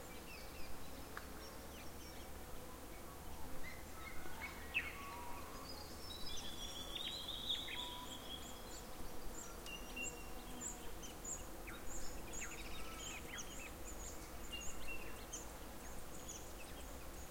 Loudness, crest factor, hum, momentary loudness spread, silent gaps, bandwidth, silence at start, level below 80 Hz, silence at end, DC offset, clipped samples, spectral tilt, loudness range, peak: -49 LUFS; 18 dB; none; 9 LU; none; 16.5 kHz; 0 s; -56 dBFS; 0 s; 0.1%; under 0.1%; -2.5 dB/octave; 7 LU; -28 dBFS